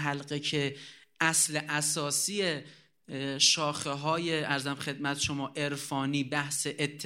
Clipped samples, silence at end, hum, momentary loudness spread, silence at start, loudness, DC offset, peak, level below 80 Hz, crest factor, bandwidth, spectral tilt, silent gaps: under 0.1%; 0 s; none; 10 LU; 0 s; -29 LUFS; under 0.1%; -10 dBFS; -68 dBFS; 22 dB; 16 kHz; -2.5 dB/octave; none